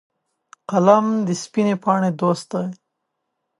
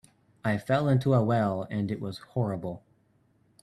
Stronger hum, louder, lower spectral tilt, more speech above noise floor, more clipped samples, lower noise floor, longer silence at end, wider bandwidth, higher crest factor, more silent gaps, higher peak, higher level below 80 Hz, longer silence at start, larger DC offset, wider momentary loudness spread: neither; first, -19 LUFS vs -28 LUFS; second, -6.5 dB/octave vs -8.5 dB/octave; first, 58 dB vs 39 dB; neither; first, -77 dBFS vs -67 dBFS; about the same, 0.85 s vs 0.85 s; about the same, 11.5 kHz vs 12.5 kHz; about the same, 20 dB vs 18 dB; neither; first, 0 dBFS vs -12 dBFS; second, -70 dBFS vs -64 dBFS; first, 0.7 s vs 0.45 s; neither; about the same, 12 LU vs 12 LU